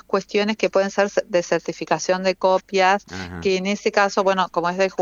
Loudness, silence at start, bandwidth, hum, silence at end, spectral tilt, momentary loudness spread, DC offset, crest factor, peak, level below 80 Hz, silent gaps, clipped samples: -21 LUFS; 0.1 s; 7.6 kHz; none; 0 s; -4 dB/octave; 6 LU; under 0.1%; 18 dB; -2 dBFS; -58 dBFS; none; under 0.1%